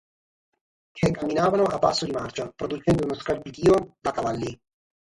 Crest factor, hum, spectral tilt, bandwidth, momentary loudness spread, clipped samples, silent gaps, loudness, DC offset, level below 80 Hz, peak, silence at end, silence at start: 18 dB; none; -6 dB/octave; 11.5 kHz; 11 LU; under 0.1%; none; -25 LUFS; under 0.1%; -50 dBFS; -8 dBFS; 0.6 s; 0.95 s